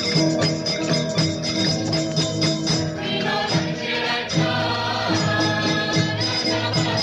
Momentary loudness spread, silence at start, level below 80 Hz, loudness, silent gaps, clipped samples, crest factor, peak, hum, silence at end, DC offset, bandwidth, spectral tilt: 2 LU; 0 s; -50 dBFS; -21 LUFS; none; under 0.1%; 14 dB; -6 dBFS; none; 0 s; under 0.1%; 11.5 kHz; -4.5 dB/octave